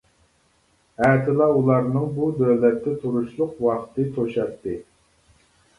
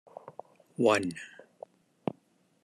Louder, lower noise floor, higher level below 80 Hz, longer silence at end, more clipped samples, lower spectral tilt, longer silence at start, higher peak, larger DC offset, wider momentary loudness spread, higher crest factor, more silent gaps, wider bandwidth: first, -22 LUFS vs -30 LUFS; second, -63 dBFS vs -68 dBFS; first, -56 dBFS vs -80 dBFS; second, 0.95 s vs 1.35 s; neither; first, -9.5 dB/octave vs -5 dB/octave; first, 1 s vs 0.25 s; first, -4 dBFS vs -12 dBFS; neither; second, 9 LU vs 26 LU; about the same, 18 dB vs 22 dB; neither; second, 11 kHz vs 13 kHz